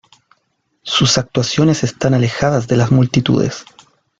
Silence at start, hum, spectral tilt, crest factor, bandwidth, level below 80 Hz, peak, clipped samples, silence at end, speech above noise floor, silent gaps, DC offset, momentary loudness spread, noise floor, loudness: 0.85 s; none; -5 dB/octave; 14 dB; 7.8 kHz; -44 dBFS; -2 dBFS; under 0.1%; 0.6 s; 52 dB; none; under 0.1%; 5 LU; -66 dBFS; -15 LUFS